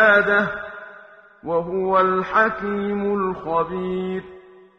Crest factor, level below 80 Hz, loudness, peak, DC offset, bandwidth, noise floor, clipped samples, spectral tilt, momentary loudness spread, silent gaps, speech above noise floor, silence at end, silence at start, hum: 18 dB; -54 dBFS; -21 LUFS; -2 dBFS; under 0.1%; 6.4 kHz; -46 dBFS; under 0.1%; -7.5 dB/octave; 14 LU; none; 25 dB; 0.4 s; 0 s; none